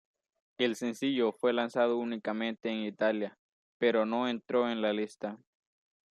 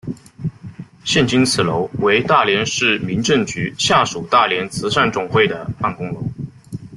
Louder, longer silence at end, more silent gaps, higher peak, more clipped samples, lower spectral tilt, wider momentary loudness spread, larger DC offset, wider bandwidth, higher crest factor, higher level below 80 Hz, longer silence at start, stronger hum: second, -32 LUFS vs -17 LUFS; first, 0.75 s vs 0 s; first, 3.39-3.80 s vs none; second, -14 dBFS vs 0 dBFS; neither; about the same, -5 dB/octave vs -4 dB/octave; second, 7 LU vs 14 LU; neither; about the same, 13 kHz vs 12.5 kHz; about the same, 18 dB vs 18 dB; second, -82 dBFS vs -50 dBFS; first, 0.6 s vs 0.05 s; neither